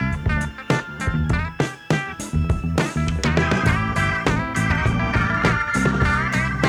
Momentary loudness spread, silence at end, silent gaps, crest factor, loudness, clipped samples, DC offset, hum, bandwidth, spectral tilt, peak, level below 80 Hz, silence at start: 5 LU; 0 s; none; 18 dB; -21 LUFS; under 0.1%; under 0.1%; none; 14.5 kHz; -6 dB/octave; -2 dBFS; -30 dBFS; 0 s